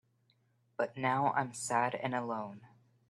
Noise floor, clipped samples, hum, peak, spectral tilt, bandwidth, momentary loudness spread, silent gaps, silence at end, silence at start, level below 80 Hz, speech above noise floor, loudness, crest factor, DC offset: -73 dBFS; under 0.1%; none; -16 dBFS; -4.5 dB/octave; 13 kHz; 10 LU; none; 0.45 s; 0.8 s; -80 dBFS; 39 dB; -34 LUFS; 20 dB; under 0.1%